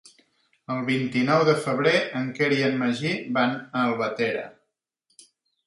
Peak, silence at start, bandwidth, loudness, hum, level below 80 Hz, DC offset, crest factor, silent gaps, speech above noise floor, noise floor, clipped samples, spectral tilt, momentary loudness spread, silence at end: -6 dBFS; 0.7 s; 11.5 kHz; -24 LUFS; none; -70 dBFS; under 0.1%; 18 dB; none; 53 dB; -77 dBFS; under 0.1%; -6 dB/octave; 9 LU; 1.15 s